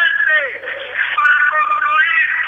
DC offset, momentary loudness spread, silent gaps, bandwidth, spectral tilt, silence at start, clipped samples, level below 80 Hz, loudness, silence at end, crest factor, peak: under 0.1%; 10 LU; none; 7.2 kHz; -1 dB/octave; 0 s; under 0.1%; -64 dBFS; -13 LUFS; 0 s; 12 dB; -4 dBFS